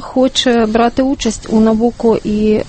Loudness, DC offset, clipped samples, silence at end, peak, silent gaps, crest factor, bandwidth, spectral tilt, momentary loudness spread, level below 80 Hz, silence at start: -13 LUFS; under 0.1%; under 0.1%; 0 s; 0 dBFS; none; 12 dB; 8.8 kHz; -5 dB/octave; 4 LU; -34 dBFS; 0 s